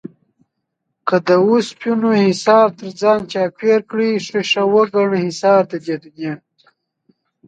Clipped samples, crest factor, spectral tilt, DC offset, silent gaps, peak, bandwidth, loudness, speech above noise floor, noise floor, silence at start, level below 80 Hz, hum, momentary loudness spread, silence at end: under 0.1%; 16 dB; -5.5 dB/octave; under 0.1%; none; 0 dBFS; 9.2 kHz; -16 LUFS; 59 dB; -74 dBFS; 0.05 s; -64 dBFS; none; 12 LU; 1.1 s